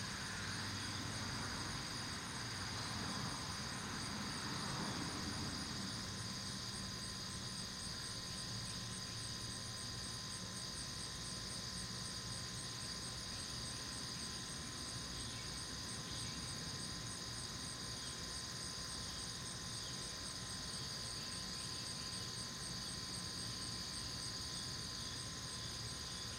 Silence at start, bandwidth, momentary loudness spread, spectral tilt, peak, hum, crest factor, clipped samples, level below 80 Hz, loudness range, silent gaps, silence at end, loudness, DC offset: 0 s; 16 kHz; 2 LU; -2.5 dB/octave; -30 dBFS; none; 14 dB; under 0.1%; -60 dBFS; 1 LU; none; 0 s; -44 LUFS; under 0.1%